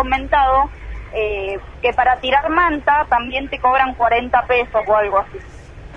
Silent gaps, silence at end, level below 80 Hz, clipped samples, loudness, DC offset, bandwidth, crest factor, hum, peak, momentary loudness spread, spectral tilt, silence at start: none; 0 s; -34 dBFS; under 0.1%; -17 LUFS; under 0.1%; 7.6 kHz; 16 dB; none; -2 dBFS; 9 LU; -6 dB/octave; 0 s